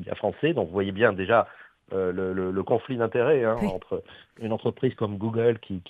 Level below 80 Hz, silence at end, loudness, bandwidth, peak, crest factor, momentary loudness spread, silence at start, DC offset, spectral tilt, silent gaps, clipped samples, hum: -56 dBFS; 0.1 s; -26 LUFS; 8 kHz; -4 dBFS; 20 dB; 11 LU; 0 s; under 0.1%; -8.5 dB/octave; none; under 0.1%; none